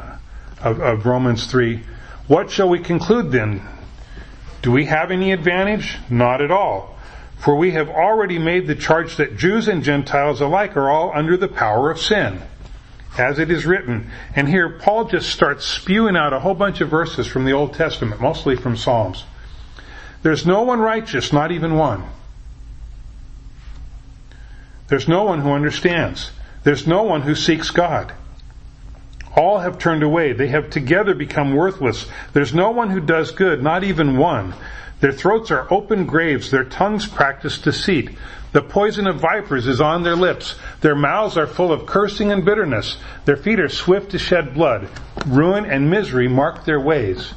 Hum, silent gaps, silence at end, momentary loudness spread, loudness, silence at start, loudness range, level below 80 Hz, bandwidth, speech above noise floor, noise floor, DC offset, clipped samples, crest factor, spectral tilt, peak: none; none; 0 s; 8 LU; -18 LUFS; 0 s; 3 LU; -38 dBFS; 8.6 kHz; 21 dB; -38 dBFS; under 0.1%; under 0.1%; 18 dB; -6 dB/octave; 0 dBFS